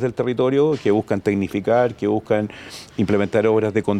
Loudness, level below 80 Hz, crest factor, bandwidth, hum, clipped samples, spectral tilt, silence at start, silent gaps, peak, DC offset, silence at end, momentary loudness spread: -20 LUFS; -56 dBFS; 14 dB; 13 kHz; none; under 0.1%; -7.5 dB/octave; 0 s; none; -6 dBFS; under 0.1%; 0 s; 6 LU